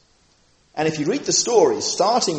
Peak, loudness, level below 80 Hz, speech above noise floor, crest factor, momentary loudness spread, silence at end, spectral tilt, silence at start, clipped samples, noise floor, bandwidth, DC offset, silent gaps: -2 dBFS; -19 LUFS; -62 dBFS; 40 dB; 18 dB; 8 LU; 0 s; -3 dB/octave; 0.75 s; under 0.1%; -59 dBFS; 8.8 kHz; under 0.1%; none